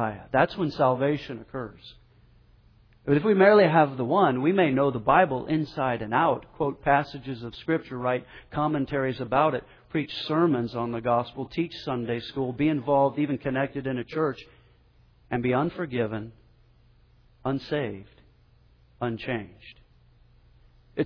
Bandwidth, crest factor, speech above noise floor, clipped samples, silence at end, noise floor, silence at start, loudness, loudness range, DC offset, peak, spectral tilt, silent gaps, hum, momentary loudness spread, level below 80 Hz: 5.4 kHz; 20 dB; 34 dB; under 0.1%; 0 s; -59 dBFS; 0 s; -26 LUFS; 12 LU; under 0.1%; -6 dBFS; -8.5 dB/octave; none; none; 13 LU; -56 dBFS